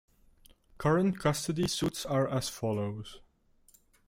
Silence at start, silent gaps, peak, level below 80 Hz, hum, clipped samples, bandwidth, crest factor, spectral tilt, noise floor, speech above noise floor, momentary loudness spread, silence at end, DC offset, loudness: 0.8 s; none; -14 dBFS; -58 dBFS; none; under 0.1%; 16.5 kHz; 18 dB; -5 dB/octave; -65 dBFS; 35 dB; 9 LU; 0.9 s; under 0.1%; -31 LUFS